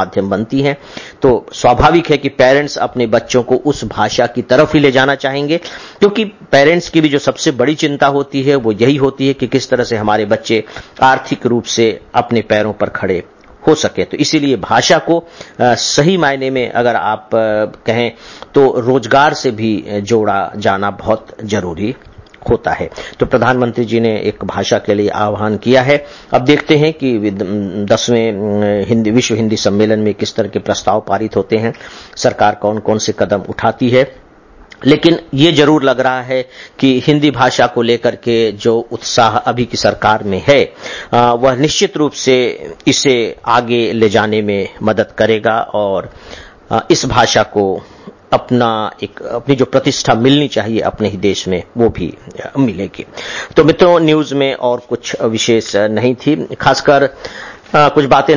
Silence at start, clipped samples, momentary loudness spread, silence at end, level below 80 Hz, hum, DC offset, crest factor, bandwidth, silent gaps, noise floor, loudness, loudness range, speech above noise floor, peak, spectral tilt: 0 s; under 0.1%; 8 LU; 0 s; -40 dBFS; none; under 0.1%; 12 dB; 7.4 kHz; none; -41 dBFS; -13 LUFS; 3 LU; 29 dB; 0 dBFS; -5 dB/octave